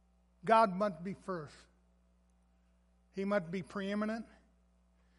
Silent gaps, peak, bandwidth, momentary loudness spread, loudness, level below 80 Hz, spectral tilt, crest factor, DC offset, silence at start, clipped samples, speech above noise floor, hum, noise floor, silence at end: none; -14 dBFS; 11.5 kHz; 16 LU; -35 LUFS; -68 dBFS; -6.5 dB/octave; 24 dB; under 0.1%; 0.45 s; under 0.1%; 36 dB; none; -70 dBFS; 0.95 s